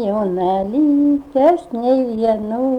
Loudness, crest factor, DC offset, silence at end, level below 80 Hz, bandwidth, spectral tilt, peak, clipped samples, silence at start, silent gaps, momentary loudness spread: -17 LUFS; 12 dB; under 0.1%; 0 s; -50 dBFS; 5.4 kHz; -8.5 dB/octave; -4 dBFS; under 0.1%; 0 s; none; 5 LU